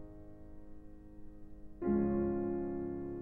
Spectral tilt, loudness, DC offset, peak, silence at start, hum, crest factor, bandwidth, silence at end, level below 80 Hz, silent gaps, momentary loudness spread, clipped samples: -12 dB/octave; -36 LUFS; under 0.1%; -22 dBFS; 0 s; none; 16 dB; 2.6 kHz; 0 s; -54 dBFS; none; 23 LU; under 0.1%